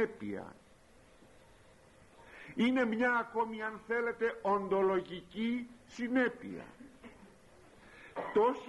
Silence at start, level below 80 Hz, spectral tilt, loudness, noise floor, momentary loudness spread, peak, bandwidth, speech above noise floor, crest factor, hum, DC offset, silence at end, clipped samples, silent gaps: 0 s; -68 dBFS; -6 dB/octave; -34 LUFS; -62 dBFS; 23 LU; -20 dBFS; 11.5 kHz; 28 dB; 16 dB; none; under 0.1%; 0 s; under 0.1%; none